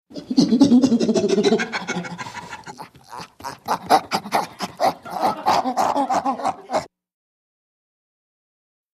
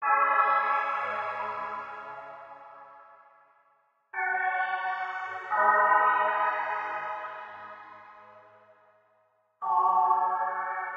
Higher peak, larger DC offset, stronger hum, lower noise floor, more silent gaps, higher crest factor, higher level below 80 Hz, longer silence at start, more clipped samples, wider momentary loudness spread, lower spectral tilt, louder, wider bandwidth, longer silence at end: first, -2 dBFS vs -10 dBFS; neither; neither; second, -40 dBFS vs -69 dBFS; neither; about the same, 20 dB vs 20 dB; first, -62 dBFS vs -84 dBFS; about the same, 0.1 s vs 0 s; neither; about the same, 19 LU vs 21 LU; about the same, -5 dB/octave vs -4 dB/octave; first, -20 LUFS vs -27 LUFS; first, 15 kHz vs 7 kHz; first, 2.05 s vs 0 s